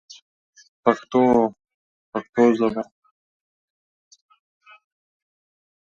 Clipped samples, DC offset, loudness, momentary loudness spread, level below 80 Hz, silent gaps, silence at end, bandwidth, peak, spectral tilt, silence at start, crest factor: under 0.1%; under 0.1%; -21 LUFS; 14 LU; -62 dBFS; 1.74-2.12 s, 2.29-2.33 s; 3.15 s; 7.4 kHz; -2 dBFS; -6.5 dB/octave; 0.85 s; 24 dB